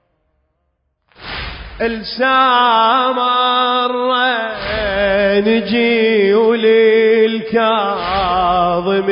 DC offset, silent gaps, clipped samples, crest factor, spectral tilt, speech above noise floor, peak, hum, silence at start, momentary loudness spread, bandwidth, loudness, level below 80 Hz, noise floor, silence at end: under 0.1%; none; under 0.1%; 12 dB; -9.5 dB/octave; 54 dB; -2 dBFS; none; 1.2 s; 10 LU; 5.4 kHz; -13 LUFS; -40 dBFS; -67 dBFS; 0 s